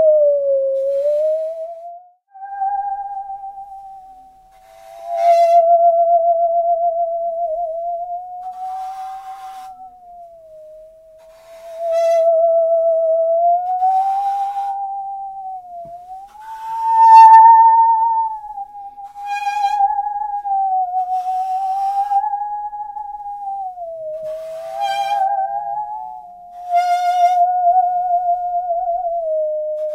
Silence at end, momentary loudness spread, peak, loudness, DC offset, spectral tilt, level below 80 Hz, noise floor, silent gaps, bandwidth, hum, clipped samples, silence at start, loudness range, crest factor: 0 s; 20 LU; 0 dBFS; -16 LUFS; under 0.1%; -1.5 dB/octave; -60 dBFS; -46 dBFS; none; 12.5 kHz; none; under 0.1%; 0 s; 15 LU; 16 dB